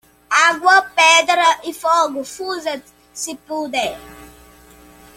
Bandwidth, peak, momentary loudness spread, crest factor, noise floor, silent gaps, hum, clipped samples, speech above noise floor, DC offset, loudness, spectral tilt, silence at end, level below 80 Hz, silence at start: 16.5 kHz; 0 dBFS; 16 LU; 18 dB; -45 dBFS; none; 60 Hz at -60 dBFS; under 0.1%; 28 dB; under 0.1%; -15 LUFS; 0 dB/octave; 0.9 s; -56 dBFS; 0.3 s